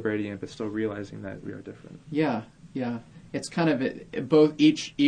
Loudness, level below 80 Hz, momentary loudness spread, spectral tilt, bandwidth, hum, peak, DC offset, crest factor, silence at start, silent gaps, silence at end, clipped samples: -27 LUFS; -60 dBFS; 18 LU; -6 dB/octave; 10 kHz; none; -8 dBFS; under 0.1%; 18 dB; 0 s; none; 0 s; under 0.1%